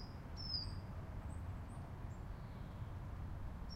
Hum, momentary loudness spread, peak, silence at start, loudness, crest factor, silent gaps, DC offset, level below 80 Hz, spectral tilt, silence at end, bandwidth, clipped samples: none; 8 LU; -30 dBFS; 0 s; -48 LUFS; 16 dB; none; under 0.1%; -52 dBFS; -6 dB/octave; 0 s; 15.5 kHz; under 0.1%